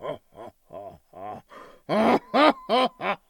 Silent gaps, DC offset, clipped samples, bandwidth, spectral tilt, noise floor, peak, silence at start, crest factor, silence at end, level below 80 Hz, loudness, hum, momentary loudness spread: none; under 0.1%; under 0.1%; 18 kHz; -5.5 dB/octave; -48 dBFS; -2 dBFS; 0 s; 24 dB; 0.15 s; -64 dBFS; -22 LUFS; none; 23 LU